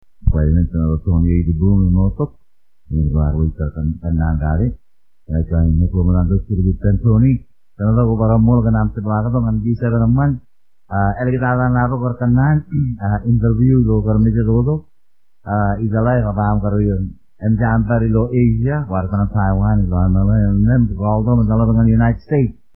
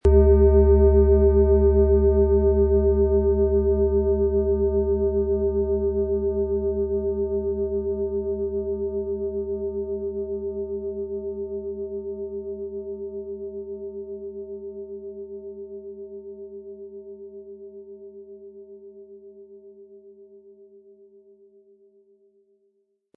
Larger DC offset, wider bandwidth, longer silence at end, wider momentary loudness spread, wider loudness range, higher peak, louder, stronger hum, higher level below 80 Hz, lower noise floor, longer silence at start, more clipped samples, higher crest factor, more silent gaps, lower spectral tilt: first, 0.6% vs under 0.1%; first, 2.8 kHz vs 2.4 kHz; second, 0.25 s vs 2.8 s; second, 7 LU vs 23 LU; second, 3 LU vs 22 LU; first, 0 dBFS vs -6 dBFS; first, -16 LUFS vs -22 LUFS; neither; first, -24 dBFS vs -30 dBFS; first, -73 dBFS vs -69 dBFS; first, 0.25 s vs 0.05 s; neither; about the same, 14 dB vs 18 dB; neither; first, -14 dB/octave vs -12.5 dB/octave